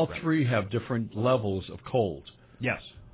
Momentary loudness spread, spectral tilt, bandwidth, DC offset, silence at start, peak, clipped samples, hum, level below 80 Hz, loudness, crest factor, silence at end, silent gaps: 8 LU; -11 dB/octave; 4 kHz; under 0.1%; 0 s; -14 dBFS; under 0.1%; none; -52 dBFS; -29 LUFS; 16 dB; 0.05 s; none